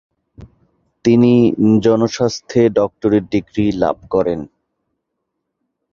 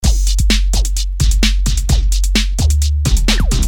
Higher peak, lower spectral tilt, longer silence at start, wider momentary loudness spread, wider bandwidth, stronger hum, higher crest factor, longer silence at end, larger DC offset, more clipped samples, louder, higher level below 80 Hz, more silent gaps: about the same, -2 dBFS vs -2 dBFS; first, -7 dB/octave vs -4 dB/octave; first, 0.4 s vs 0 s; first, 8 LU vs 3 LU; second, 7.2 kHz vs 17 kHz; neither; about the same, 14 dB vs 12 dB; first, 1.45 s vs 0 s; neither; neither; about the same, -15 LUFS vs -15 LUFS; second, -46 dBFS vs -14 dBFS; neither